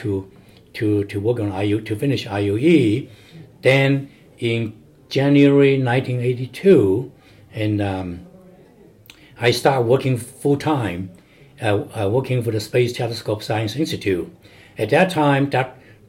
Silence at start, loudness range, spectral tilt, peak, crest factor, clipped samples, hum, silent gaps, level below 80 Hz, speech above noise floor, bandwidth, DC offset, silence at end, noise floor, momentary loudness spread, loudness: 0 s; 5 LU; -6.5 dB/octave; -2 dBFS; 18 dB; under 0.1%; none; none; -58 dBFS; 30 dB; 16 kHz; under 0.1%; 0.35 s; -48 dBFS; 13 LU; -19 LUFS